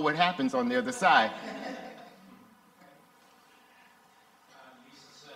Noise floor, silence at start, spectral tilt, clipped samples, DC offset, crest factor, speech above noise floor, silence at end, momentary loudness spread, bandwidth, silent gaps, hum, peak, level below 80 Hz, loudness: -61 dBFS; 0 s; -4 dB/octave; under 0.1%; under 0.1%; 24 dB; 35 dB; 0 s; 24 LU; 15.5 kHz; none; none; -8 dBFS; -78 dBFS; -27 LUFS